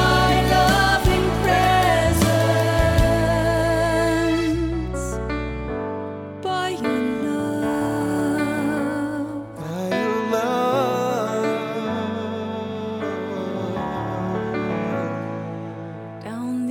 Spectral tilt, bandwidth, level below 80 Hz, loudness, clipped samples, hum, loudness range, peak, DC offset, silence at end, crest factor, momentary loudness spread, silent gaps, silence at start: -5.5 dB/octave; 18.5 kHz; -34 dBFS; -22 LUFS; under 0.1%; none; 8 LU; -6 dBFS; under 0.1%; 0 s; 14 dB; 12 LU; none; 0 s